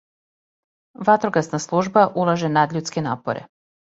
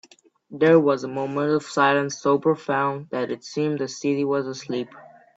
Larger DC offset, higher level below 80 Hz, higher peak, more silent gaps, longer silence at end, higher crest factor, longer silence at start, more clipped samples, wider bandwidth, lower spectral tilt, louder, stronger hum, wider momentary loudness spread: neither; first, -62 dBFS vs -70 dBFS; about the same, -2 dBFS vs -4 dBFS; neither; first, 0.45 s vs 0.3 s; about the same, 20 dB vs 20 dB; first, 1 s vs 0.5 s; neither; about the same, 8 kHz vs 8 kHz; about the same, -5.5 dB/octave vs -5.5 dB/octave; first, -20 LUFS vs -23 LUFS; neither; about the same, 9 LU vs 11 LU